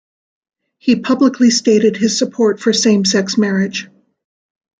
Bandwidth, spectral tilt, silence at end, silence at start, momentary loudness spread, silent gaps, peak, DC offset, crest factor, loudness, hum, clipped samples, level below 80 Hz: 9.4 kHz; -4 dB/octave; 0.95 s; 0.85 s; 6 LU; none; -2 dBFS; under 0.1%; 14 dB; -14 LUFS; none; under 0.1%; -60 dBFS